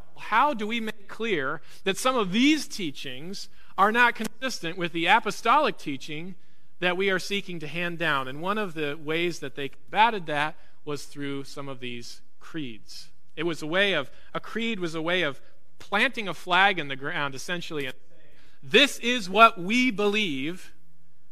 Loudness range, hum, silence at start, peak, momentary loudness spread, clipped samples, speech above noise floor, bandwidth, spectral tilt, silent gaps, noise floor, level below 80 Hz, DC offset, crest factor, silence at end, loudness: 7 LU; none; 0.15 s; -2 dBFS; 16 LU; under 0.1%; 39 dB; 14.5 kHz; -3.5 dB/octave; none; -65 dBFS; -62 dBFS; 2%; 26 dB; 0.65 s; -25 LUFS